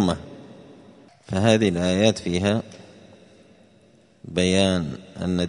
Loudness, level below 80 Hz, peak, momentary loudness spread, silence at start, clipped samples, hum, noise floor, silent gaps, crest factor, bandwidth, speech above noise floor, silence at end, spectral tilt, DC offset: -22 LUFS; -52 dBFS; -2 dBFS; 14 LU; 0 s; under 0.1%; none; -56 dBFS; none; 22 dB; 10.5 kHz; 34 dB; 0 s; -5.5 dB/octave; under 0.1%